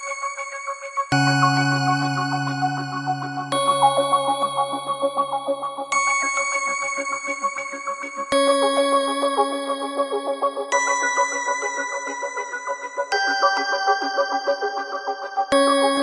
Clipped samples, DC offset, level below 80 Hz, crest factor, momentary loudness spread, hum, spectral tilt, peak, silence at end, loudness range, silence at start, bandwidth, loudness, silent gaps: under 0.1%; under 0.1%; -66 dBFS; 16 dB; 10 LU; none; -3.5 dB/octave; -6 dBFS; 0 s; 2 LU; 0 s; 11.5 kHz; -22 LUFS; none